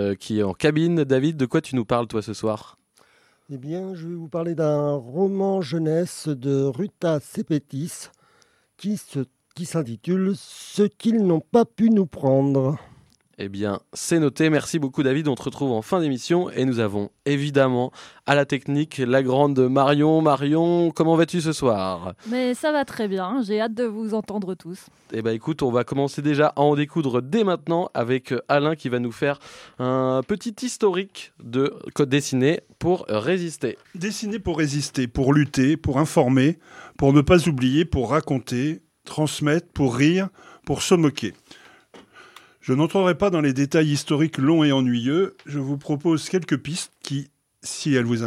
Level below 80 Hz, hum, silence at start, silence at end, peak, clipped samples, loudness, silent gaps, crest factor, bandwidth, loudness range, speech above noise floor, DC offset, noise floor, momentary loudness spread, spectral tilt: -50 dBFS; none; 0 s; 0 s; -2 dBFS; under 0.1%; -22 LUFS; none; 22 dB; 15 kHz; 6 LU; 39 dB; under 0.1%; -61 dBFS; 12 LU; -6 dB/octave